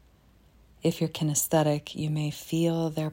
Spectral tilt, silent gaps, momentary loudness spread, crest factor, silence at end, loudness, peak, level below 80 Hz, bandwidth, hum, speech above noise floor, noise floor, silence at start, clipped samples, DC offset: -5 dB/octave; none; 6 LU; 18 dB; 0 s; -28 LUFS; -10 dBFS; -60 dBFS; 16.5 kHz; none; 32 dB; -59 dBFS; 0.85 s; under 0.1%; under 0.1%